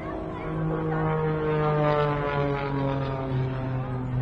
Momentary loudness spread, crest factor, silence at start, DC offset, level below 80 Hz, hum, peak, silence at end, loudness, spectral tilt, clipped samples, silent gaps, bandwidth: 7 LU; 18 dB; 0 s; under 0.1%; -42 dBFS; none; -8 dBFS; 0 s; -27 LUFS; -9.5 dB/octave; under 0.1%; none; 5.6 kHz